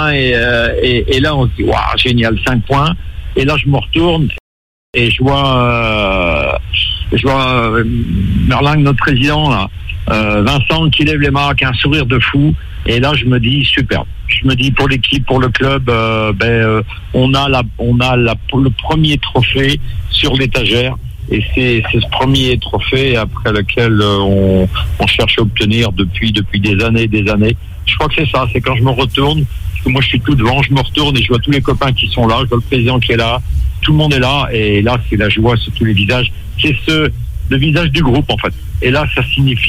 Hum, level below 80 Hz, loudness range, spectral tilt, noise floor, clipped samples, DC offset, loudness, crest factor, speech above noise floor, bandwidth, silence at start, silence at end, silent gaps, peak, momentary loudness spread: none; -22 dBFS; 1 LU; -6.5 dB/octave; under -90 dBFS; under 0.1%; under 0.1%; -12 LUFS; 12 dB; over 78 dB; 15.5 kHz; 0 s; 0 s; 4.40-4.93 s; 0 dBFS; 4 LU